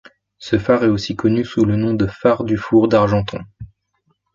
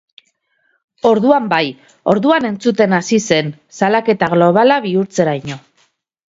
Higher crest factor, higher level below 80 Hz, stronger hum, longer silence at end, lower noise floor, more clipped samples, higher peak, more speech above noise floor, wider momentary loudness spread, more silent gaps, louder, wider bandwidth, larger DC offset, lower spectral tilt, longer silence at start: about the same, 16 dB vs 16 dB; first, -42 dBFS vs -58 dBFS; neither; about the same, 0.7 s vs 0.7 s; about the same, -66 dBFS vs -63 dBFS; neither; about the same, -2 dBFS vs 0 dBFS; about the same, 50 dB vs 49 dB; about the same, 12 LU vs 11 LU; neither; second, -17 LUFS vs -14 LUFS; about the same, 7.6 kHz vs 7.8 kHz; neither; first, -7.5 dB/octave vs -5.5 dB/octave; second, 0.4 s vs 1.05 s